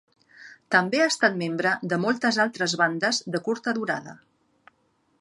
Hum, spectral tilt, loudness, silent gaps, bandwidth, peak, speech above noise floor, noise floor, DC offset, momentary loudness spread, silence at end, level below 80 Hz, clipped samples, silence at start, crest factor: none; -3.5 dB/octave; -24 LUFS; none; 11.5 kHz; -6 dBFS; 44 dB; -68 dBFS; under 0.1%; 7 LU; 1.05 s; -76 dBFS; under 0.1%; 0.4 s; 20 dB